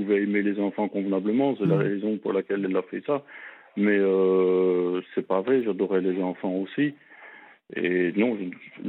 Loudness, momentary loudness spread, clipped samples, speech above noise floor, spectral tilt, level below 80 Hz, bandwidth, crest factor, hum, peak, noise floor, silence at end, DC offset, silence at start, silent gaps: -25 LUFS; 8 LU; under 0.1%; 24 dB; -10.5 dB/octave; -82 dBFS; 4.1 kHz; 16 dB; none; -10 dBFS; -49 dBFS; 0 s; under 0.1%; 0 s; none